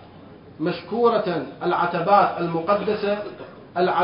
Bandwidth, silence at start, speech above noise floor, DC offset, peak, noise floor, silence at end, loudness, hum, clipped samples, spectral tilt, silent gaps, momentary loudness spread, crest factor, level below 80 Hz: 5.4 kHz; 0 s; 23 dB; under 0.1%; -4 dBFS; -44 dBFS; 0 s; -22 LUFS; none; under 0.1%; -11 dB/octave; none; 11 LU; 20 dB; -60 dBFS